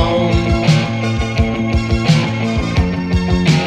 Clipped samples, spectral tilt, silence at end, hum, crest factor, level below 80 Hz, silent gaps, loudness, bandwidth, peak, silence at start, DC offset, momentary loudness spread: under 0.1%; -6.5 dB/octave; 0 s; none; 14 dB; -24 dBFS; none; -15 LUFS; 11 kHz; 0 dBFS; 0 s; under 0.1%; 4 LU